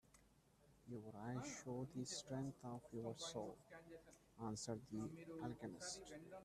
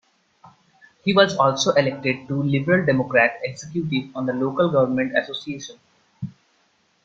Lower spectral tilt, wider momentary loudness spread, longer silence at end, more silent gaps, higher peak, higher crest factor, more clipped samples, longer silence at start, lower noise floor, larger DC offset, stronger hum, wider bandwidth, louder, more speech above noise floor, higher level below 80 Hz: about the same, -4.5 dB/octave vs -5 dB/octave; second, 12 LU vs 16 LU; second, 0 s vs 0.75 s; neither; second, -34 dBFS vs -2 dBFS; about the same, 18 dB vs 20 dB; neither; second, 0.05 s vs 0.45 s; first, -74 dBFS vs -64 dBFS; neither; neither; first, 14 kHz vs 7.8 kHz; second, -51 LUFS vs -21 LUFS; second, 23 dB vs 43 dB; second, -76 dBFS vs -62 dBFS